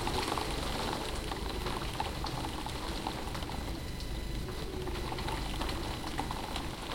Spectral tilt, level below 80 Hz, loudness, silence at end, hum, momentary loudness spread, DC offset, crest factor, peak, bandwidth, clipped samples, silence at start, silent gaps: -4.5 dB/octave; -42 dBFS; -37 LUFS; 0 s; none; 5 LU; under 0.1%; 18 dB; -18 dBFS; 17 kHz; under 0.1%; 0 s; none